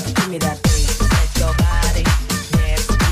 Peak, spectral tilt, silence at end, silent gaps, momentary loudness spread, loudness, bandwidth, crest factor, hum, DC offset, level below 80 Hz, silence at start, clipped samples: -4 dBFS; -4.5 dB/octave; 0 s; none; 3 LU; -18 LUFS; 15.5 kHz; 10 dB; none; under 0.1%; -20 dBFS; 0 s; under 0.1%